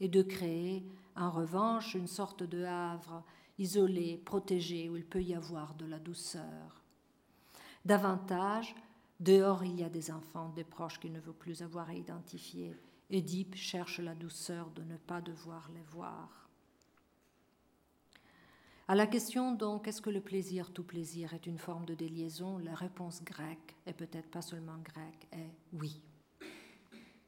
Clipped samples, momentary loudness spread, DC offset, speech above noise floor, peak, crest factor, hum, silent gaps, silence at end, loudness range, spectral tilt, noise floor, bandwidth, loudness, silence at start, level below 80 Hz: under 0.1%; 19 LU; under 0.1%; 34 dB; -14 dBFS; 24 dB; none; none; 0.2 s; 14 LU; -5.5 dB/octave; -72 dBFS; 16.5 kHz; -38 LUFS; 0 s; -70 dBFS